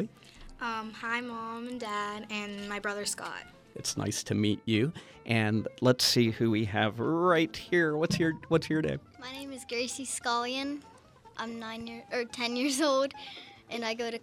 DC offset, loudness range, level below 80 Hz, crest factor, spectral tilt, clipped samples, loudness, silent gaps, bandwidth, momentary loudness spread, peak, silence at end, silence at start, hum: under 0.1%; 8 LU; -62 dBFS; 20 dB; -4.5 dB/octave; under 0.1%; -31 LUFS; none; 16 kHz; 14 LU; -10 dBFS; 0.05 s; 0 s; none